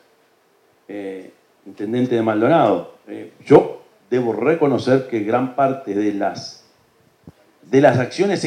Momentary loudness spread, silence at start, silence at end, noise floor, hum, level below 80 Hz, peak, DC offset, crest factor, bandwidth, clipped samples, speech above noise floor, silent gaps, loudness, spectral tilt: 21 LU; 0.9 s; 0 s; -58 dBFS; none; -62 dBFS; 0 dBFS; under 0.1%; 18 dB; 10.5 kHz; under 0.1%; 41 dB; none; -18 LUFS; -7 dB/octave